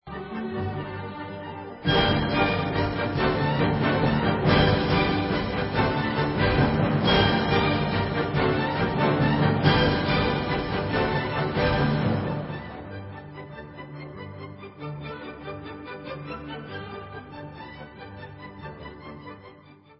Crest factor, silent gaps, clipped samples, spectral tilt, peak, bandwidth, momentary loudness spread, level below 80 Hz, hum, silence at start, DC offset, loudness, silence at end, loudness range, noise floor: 20 dB; none; under 0.1%; -10.5 dB/octave; -6 dBFS; 5.8 kHz; 19 LU; -40 dBFS; none; 0.05 s; under 0.1%; -24 LUFS; 0.25 s; 16 LU; -51 dBFS